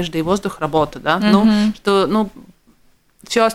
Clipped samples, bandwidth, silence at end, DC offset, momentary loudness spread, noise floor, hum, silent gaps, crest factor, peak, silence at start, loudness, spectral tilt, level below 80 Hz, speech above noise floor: under 0.1%; 14 kHz; 0 s; under 0.1%; 7 LU; -54 dBFS; none; none; 18 dB; 0 dBFS; 0 s; -17 LUFS; -5.5 dB/octave; -44 dBFS; 38 dB